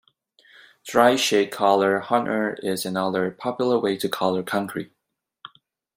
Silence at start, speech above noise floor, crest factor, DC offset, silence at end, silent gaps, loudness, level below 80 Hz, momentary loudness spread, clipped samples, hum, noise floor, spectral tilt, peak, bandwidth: 0.85 s; 59 dB; 22 dB; under 0.1%; 0.5 s; none; -22 LUFS; -68 dBFS; 9 LU; under 0.1%; none; -81 dBFS; -4 dB/octave; -2 dBFS; 16.5 kHz